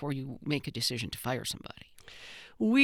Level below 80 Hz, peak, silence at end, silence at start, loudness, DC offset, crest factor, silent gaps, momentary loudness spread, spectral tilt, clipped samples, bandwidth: -62 dBFS; -12 dBFS; 0 s; 0 s; -33 LUFS; under 0.1%; 22 dB; none; 18 LU; -4.5 dB/octave; under 0.1%; over 20 kHz